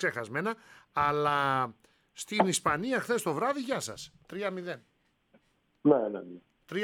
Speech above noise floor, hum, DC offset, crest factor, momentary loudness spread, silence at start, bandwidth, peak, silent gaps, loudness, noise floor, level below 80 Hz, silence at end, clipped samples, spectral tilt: 37 dB; none; under 0.1%; 22 dB; 16 LU; 0 s; 18 kHz; -10 dBFS; none; -30 LUFS; -67 dBFS; -66 dBFS; 0 s; under 0.1%; -4.5 dB/octave